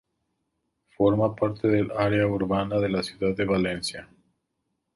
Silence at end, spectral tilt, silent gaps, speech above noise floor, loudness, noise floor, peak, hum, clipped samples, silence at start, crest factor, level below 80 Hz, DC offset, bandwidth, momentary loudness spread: 0.9 s; -6.5 dB/octave; none; 54 dB; -25 LUFS; -78 dBFS; -8 dBFS; none; under 0.1%; 1 s; 18 dB; -52 dBFS; under 0.1%; 11.5 kHz; 5 LU